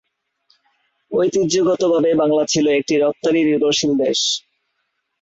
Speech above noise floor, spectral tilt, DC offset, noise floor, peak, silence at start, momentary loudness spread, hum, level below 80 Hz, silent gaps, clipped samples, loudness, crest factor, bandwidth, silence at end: 56 dB; -4 dB/octave; under 0.1%; -72 dBFS; -6 dBFS; 1.1 s; 3 LU; none; -60 dBFS; none; under 0.1%; -17 LUFS; 12 dB; 8 kHz; 0.8 s